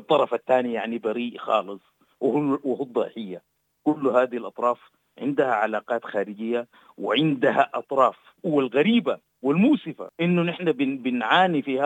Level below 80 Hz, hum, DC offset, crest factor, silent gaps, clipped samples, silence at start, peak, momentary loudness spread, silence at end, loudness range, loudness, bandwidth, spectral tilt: -80 dBFS; none; under 0.1%; 20 dB; none; under 0.1%; 0.1 s; -4 dBFS; 11 LU; 0 s; 4 LU; -24 LUFS; 9 kHz; -7.5 dB/octave